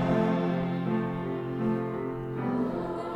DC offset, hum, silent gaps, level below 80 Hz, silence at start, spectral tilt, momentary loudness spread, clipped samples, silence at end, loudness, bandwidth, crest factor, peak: under 0.1%; none; none; -56 dBFS; 0 s; -9 dB/octave; 7 LU; under 0.1%; 0 s; -30 LUFS; 6.6 kHz; 14 dB; -14 dBFS